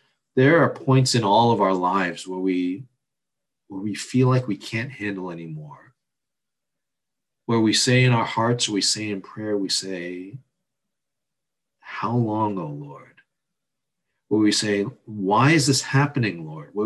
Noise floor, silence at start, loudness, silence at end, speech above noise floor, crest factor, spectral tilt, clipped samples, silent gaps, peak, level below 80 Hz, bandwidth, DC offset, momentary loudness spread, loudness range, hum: -86 dBFS; 0.35 s; -21 LUFS; 0 s; 65 dB; 18 dB; -5 dB/octave; under 0.1%; none; -6 dBFS; -62 dBFS; 12.5 kHz; under 0.1%; 17 LU; 8 LU; none